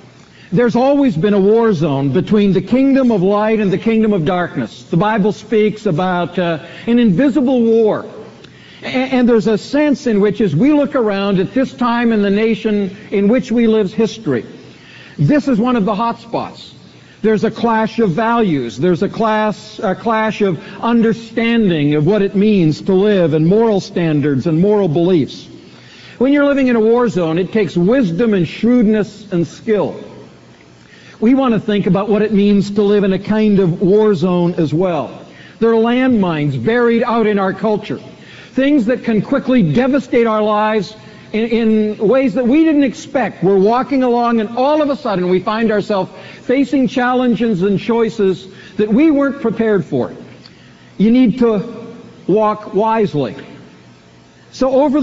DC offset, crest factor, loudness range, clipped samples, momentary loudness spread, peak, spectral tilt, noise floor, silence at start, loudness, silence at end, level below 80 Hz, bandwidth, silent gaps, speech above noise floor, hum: under 0.1%; 12 dB; 3 LU; under 0.1%; 8 LU; -2 dBFS; -6.5 dB/octave; -44 dBFS; 0.5 s; -14 LUFS; 0 s; -46 dBFS; 7.8 kHz; none; 30 dB; none